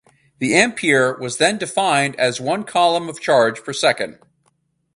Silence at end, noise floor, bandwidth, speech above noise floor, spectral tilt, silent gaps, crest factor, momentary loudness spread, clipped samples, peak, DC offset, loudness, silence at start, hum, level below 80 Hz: 0.85 s; -65 dBFS; 11.5 kHz; 47 dB; -3 dB/octave; none; 18 dB; 7 LU; under 0.1%; 0 dBFS; under 0.1%; -18 LUFS; 0.4 s; none; -62 dBFS